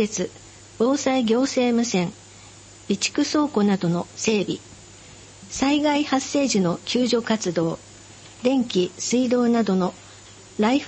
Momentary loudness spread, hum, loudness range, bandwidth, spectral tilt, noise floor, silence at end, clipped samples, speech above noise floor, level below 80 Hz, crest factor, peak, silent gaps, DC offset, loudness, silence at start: 12 LU; none; 2 LU; 8.8 kHz; -4.5 dB/octave; -45 dBFS; 0 s; under 0.1%; 24 dB; -58 dBFS; 14 dB; -8 dBFS; none; under 0.1%; -22 LUFS; 0 s